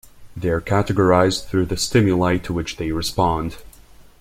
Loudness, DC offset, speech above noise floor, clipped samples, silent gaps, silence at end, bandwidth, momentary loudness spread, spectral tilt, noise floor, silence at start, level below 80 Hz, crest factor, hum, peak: -20 LUFS; under 0.1%; 27 dB; under 0.1%; none; 0.2 s; 16 kHz; 10 LU; -5.5 dB/octave; -46 dBFS; 0.15 s; -40 dBFS; 18 dB; none; -2 dBFS